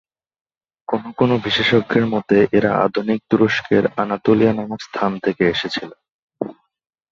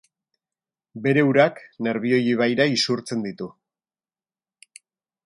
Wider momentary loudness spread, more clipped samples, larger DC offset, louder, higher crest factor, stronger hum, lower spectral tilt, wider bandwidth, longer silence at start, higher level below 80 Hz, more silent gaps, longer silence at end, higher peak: about the same, 13 LU vs 12 LU; neither; neither; first, -18 LUFS vs -21 LUFS; about the same, 18 dB vs 20 dB; neither; about the same, -6.5 dB/octave vs -5.5 dB/octave; second, 7.4 kHz vs 11.5 kHz; about the same, 0.9 s vs 0.95 s; first, -52 dBFS vs -70 dBFS; first, 6.11-6.28 s vs none; second, 0.6 s vs 1.75 s; about the same, -2 dBFS vs -4 dBFS